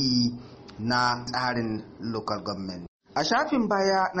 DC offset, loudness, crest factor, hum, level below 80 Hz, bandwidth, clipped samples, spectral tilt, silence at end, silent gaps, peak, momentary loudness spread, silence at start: under 0.1%; -27 LUFS; 16 dB; none; -58 dBFS; 8.4 kHz; under 0.1%; -4.5 dB/octave; 0 s; 2.88-3.00 s; -12 dBFS; 12 LU; 0 s